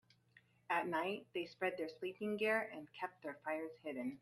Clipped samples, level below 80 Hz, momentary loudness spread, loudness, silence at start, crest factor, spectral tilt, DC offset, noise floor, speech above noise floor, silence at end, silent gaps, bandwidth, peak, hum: under 0.1%; -86 dBFS; 10 LU; -42 LUFS; 0.7 s; 20 dB; -5.5 dB/octave; under 0.1%; -71 dBFS; 29 dB; 0.05 s; none; 14 kHz; -24 dBFS; none